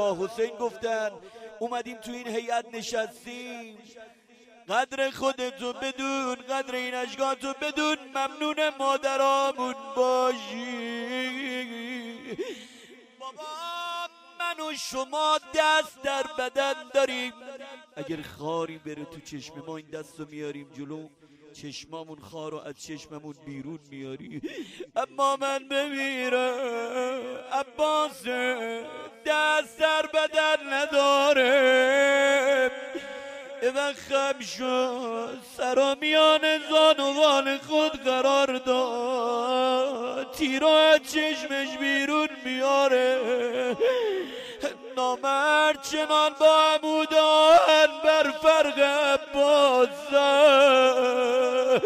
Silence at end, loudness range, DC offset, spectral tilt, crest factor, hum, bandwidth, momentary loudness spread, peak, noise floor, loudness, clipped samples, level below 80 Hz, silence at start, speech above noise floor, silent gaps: 0 s; 17 LU; under 0.1%; -2.5 dB/octave; 18 dB; none; 15.5 kHz; 20 LU; -8 dBFS; -49 dBFS; -24 LUFS; under 0.1%; -68 dBFS; 0 s; 24 dB; none